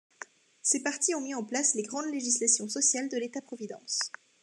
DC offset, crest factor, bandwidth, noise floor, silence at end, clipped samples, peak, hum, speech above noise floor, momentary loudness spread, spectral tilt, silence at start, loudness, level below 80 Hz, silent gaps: under 0.1%; 20 dB; 12.5 kHz; -50 dBFS; 0.35 s; under 0.1%; -12 dBFS; none; 20 dB; 16 LU; -1 dB/octave; 0.2 s; -28 LUFS; under -90 dBFS; none